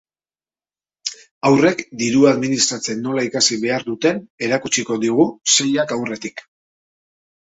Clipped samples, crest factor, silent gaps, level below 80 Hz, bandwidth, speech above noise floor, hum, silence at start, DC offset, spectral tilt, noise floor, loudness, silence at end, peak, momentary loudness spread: under 0.1%; 18 dB; 1.31-1.41 s, 4.30-4.38 s; -60 dBFS; 8.2 kHz; over 72 dB; none; 1.05 s; under 0.1%; -3 dB/octave; under -90 dBFS; -17 LUFS; 1.1 s; -2 dBFS; 14 LU